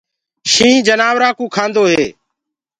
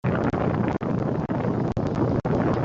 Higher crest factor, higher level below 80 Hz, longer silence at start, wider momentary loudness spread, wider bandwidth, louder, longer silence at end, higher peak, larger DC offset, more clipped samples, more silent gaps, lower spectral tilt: about the same, 14 dB vs 14 dB; second, -52 dBFS vs -44 dBFS; first, 0.45 s vs 0.05 s; first, 9 LU vs 2 LU; first, 11 kHz vs 7.4 kHz; first, -12 LUFS vs -25 LUFS; first, 0.7 s vs 0 s; first, 0 dBFS vs -10 dBFS; neither; neither; neither; second, -2.5 dB/octave vs -9.5 dB/octave